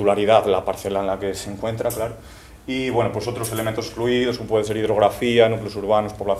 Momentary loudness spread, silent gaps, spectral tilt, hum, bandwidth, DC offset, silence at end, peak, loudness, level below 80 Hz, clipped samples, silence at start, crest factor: 11 LU; none; -5 dB/octave; none; 16 kHz; under 0.1%; 0 s; -2 dBFS; -21 LUFS; -46 dBFS; under 0.1%; 0 s; 18 dB